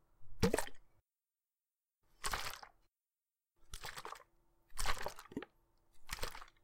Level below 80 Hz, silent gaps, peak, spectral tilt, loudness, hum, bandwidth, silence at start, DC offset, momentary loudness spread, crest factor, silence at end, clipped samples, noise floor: -52 dBFS; none; -18 dBFS; -3.5 dB/octave; -43 LUFS; none; 17 kHz; 0.2 s; under 0.1%; 17 LU; 24 dB; 0.15 s; under 0.1%; under -90 dBFS